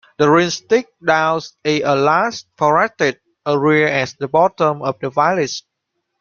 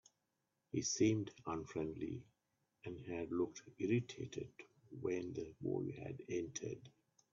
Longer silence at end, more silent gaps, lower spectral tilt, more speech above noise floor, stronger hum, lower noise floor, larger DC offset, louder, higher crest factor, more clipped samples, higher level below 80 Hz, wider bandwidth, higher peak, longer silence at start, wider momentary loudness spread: first, 0.6 s vs 0.45 s; neither; second, -5 dB/octave vs -6.5 dB/octave; first, 58 dB vs 45 dB; neither; second, -74 dBFS vs -87 dBFS; neither; first, -16 LUFS vs -43 LUFS; about the same, 16 dB vs 20 dB; neither; first, -58 dBFS vs -74 dBFS; about the same, 7.2 kHz vs 7.4 kHz; first, -2 dBFS vs -22 dBFS; second, 0.2 s vs 0.75 s; second, 7 LU vs 16 LU